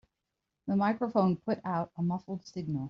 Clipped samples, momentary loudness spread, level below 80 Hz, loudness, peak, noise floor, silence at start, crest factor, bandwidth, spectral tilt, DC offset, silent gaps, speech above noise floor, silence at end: under 0.1%; 10 LU; -68 dBFS; -32 LUFS; -14 dBFS; -86 dBFS; 0.65 s; 18 dB; 6.8 kHz; -7.5 dB/octave; under 0.1%; none; 55 dB; 0 s